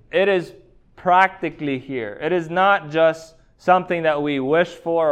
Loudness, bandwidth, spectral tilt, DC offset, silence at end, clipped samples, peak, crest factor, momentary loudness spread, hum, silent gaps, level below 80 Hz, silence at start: -20 LUFS; 9.4 kHz; -6 dB/octave; under 0.1%; 0 s; under 0.1%; -2 dBFS; 18 dB; 10 LU; none; none; -56 dBFS; 0.15 s